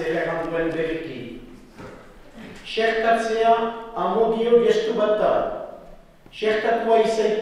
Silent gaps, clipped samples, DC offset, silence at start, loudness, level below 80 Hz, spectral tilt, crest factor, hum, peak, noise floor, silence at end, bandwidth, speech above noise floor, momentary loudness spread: none; under 0.1%; under 0.1%; 0 s; -21 LUFS; -50 dBFS; -5 dB/octave; 16 dB; none; -6 dBFS; -45 dBFS; 0 s; 11 kHz; 24 dB; 22 LU